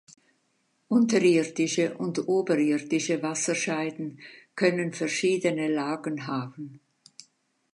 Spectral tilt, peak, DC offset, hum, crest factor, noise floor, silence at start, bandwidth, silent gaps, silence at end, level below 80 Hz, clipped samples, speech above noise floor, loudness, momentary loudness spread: -4.5 dB/octave; -10 dBFS; under 0.1%; none; 18 dB; -72 dBFS; 0.9 s; 11 kHz; none; 0.95 s; -80 dBFS; under 0.1%; 46 dB; -26 LUFS; 15 LU